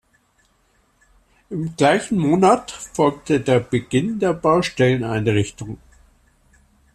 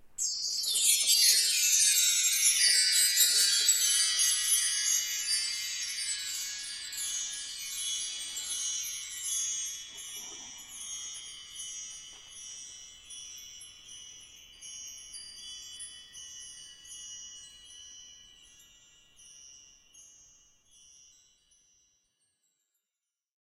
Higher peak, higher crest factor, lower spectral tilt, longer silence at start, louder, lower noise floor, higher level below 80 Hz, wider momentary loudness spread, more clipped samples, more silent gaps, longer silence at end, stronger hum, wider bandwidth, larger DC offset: first, -2 dBFS vs -10 dBFS; second, 18 dB vs 24 dB; first, -6 dB/octave vs 4.5 dB/octave; first, 1.5 s vs 0 s; first, -19 LUFS vs -26 LUFS; second, -62 dBFS vs -90 dBFS; first, -50 dBFS vs -72 dBFS; second, 13 LU vs 24 LU; neither; neither; second, 1.2 s vs 3.55 s; neither; second, 13 kHz vs 16 kHz; neither